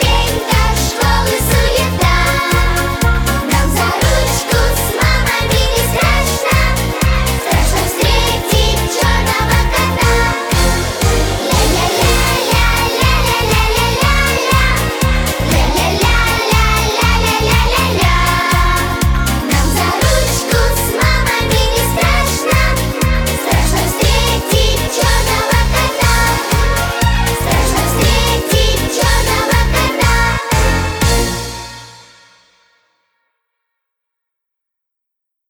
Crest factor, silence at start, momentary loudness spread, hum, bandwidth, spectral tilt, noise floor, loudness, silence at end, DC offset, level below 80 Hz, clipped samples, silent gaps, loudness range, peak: 12 dB; 0 s; 3 LU; none; over 20 kHz; -4 dB/octave; -78 dBFS; -13 LUFS; 3.5 s; under 0.1%; -18 dBFS; under 0.1%; none; 1 LU; -2 dBFS